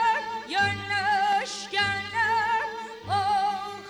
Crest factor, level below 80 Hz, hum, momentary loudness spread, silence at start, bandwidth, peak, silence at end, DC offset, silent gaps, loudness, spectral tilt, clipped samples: 12 dB; -62 dBFS; none; 6 LU; 0 s; 12.5 kHz; -14 dBFS; 0 s; under 0.1%; none; -26 LUFS; -2.5 dB/octave; under 0.1%